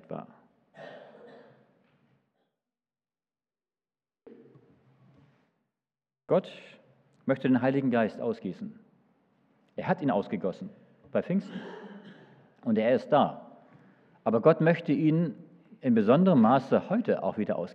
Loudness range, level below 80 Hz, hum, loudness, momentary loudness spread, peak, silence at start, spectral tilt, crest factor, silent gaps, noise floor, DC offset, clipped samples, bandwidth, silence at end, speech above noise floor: 11 LU; -82 dBFS; none; -27 LUFS; 23 LU; -8 dBFS; 0.1 s; -9.5 dB/octave; 22 dB; none; under -90 dBFS; under 0.1%; under 0.1%; 6.4 kHz; 0.05 s; over 64 dB